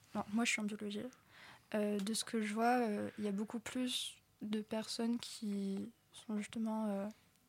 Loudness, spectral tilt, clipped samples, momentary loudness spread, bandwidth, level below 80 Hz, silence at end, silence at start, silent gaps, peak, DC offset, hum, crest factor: -39 LUFS; -4 dB/octave; under 0.1%; 13 LU; 16.5 kHz; -82 dBFS; 0.35 s; 0.15 s; none; -22 dBFS; under 0.1%; none; 18 dB